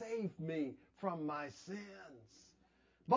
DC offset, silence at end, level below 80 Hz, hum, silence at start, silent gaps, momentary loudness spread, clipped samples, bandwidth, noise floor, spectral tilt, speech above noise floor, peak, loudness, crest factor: under 0.1%; 0 s; -80 dBFS; none; 0 s; none; 18 LU; under 0.1%; 7.6 kHz; -73 dBFS; -7 dB/octave; 29 dB; -18 dBFS; -44 LUFS; 24 dB